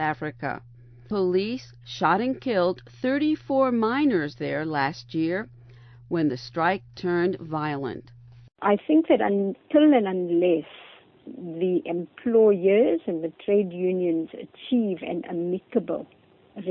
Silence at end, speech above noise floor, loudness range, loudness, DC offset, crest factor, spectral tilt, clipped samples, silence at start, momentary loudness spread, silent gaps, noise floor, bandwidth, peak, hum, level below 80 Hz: 0 s; 24 dB; 4 LU; -25 LUFS; under 0.1%; 16 dB; -7.5 dB/octave; under 0.1%; 0 s; 13 LU; none; -48 dBFS; 6.4 kHz; -8 dBFS; none; -62 dBFS